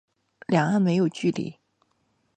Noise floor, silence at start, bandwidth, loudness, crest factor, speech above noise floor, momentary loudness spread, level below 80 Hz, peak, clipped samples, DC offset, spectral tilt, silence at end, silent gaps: -70 dBFS; 0.5 s; 9.2 kHz; -24 LUFS; 20 dB; 47 dB; 14 LU; -70 dBFS; -6 dBFS; under 0.1%; under 0.1%; -7 dB/octave; 0.85 s; none